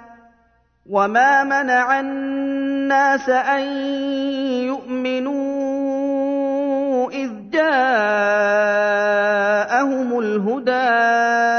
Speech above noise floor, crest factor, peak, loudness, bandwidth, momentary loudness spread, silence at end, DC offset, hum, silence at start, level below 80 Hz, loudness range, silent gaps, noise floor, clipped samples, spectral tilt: 42 dB; 16 dB; -4 dBFS; -18 LUFS; 6.6 kHz; 7 LU; 0 s; under 0.1%; none; 0 s; -64 dBFS; 4 LU; none; -59 dBFS; under 0.1%; -4.5 dB/octave